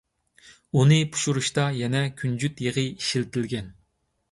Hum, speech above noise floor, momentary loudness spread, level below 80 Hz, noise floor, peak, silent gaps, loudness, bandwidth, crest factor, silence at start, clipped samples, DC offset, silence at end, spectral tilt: none; 47 dB; 10 LU; -58 dBFS; -70 dBFS; -8 dBFS; none; -24 LUFS; 11.5 kHz; 18 dB; 0.45 s; under 0.1%; under 0.1%; 0.6 s; -5 dB/octave